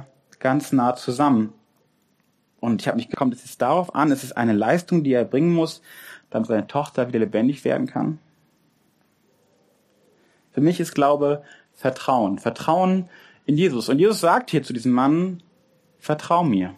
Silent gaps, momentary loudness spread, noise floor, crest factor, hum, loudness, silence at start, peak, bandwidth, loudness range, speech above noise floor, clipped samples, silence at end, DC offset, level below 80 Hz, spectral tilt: none; 10 LU; -66 dBFS; 18 dB; none; -22 LUFS; 0 s; -4 dBFS; 15 kHz; 5 LU; 45 dB; under 0.1%; 0 s; under 0.1%; -68 dBFS; -6.5 dB/octave